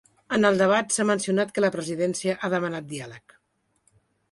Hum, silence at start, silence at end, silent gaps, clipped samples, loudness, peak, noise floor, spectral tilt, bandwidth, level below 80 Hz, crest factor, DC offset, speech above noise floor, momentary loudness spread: none; 0.3 s; 1.15 s; none; under 0.1%; -24 LUFS; -8 dBFS; -72 dBFS; -4.5 dB/octave; 11.5 kHz; -66 dBFS; 18 dB; under 0.1%; 48 dB; 13 LU